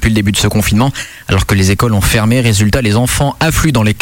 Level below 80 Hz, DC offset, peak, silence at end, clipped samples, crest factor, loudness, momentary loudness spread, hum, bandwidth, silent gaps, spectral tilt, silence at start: -24 dBFS; under 0.1%; -2 dBFS; 0 s; under 0.1%; 10 dB; -11 LUFS; 3 LU; none; 17 kHz; none; -5 dB/octave; 0 s